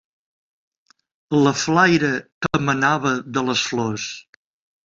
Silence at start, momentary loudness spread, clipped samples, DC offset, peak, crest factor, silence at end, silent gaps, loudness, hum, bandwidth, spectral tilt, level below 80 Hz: 1.3 s; 9 LU; under 0.1%; under 0.1%; -2 dBFS; 18 dB; 0.65 s; 2.32-2.41 s; -19 LUFS; none; 7.8 kHz; -4.5 dB/octave; -56 dBFS